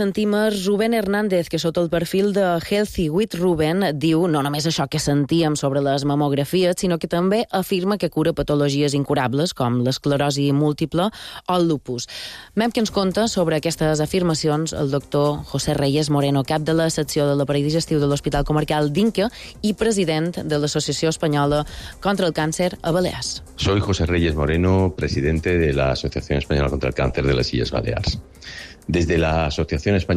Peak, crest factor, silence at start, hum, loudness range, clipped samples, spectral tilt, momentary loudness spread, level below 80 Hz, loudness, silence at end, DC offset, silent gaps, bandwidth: -8 dBFS; 12 dB; 0 s; none; 2 LU; under 0.1%; -5.5 dB/octave; 5 LU; -38 dBFS; -20 LUFS; 0 s; under 0.1%; none; 15 kHz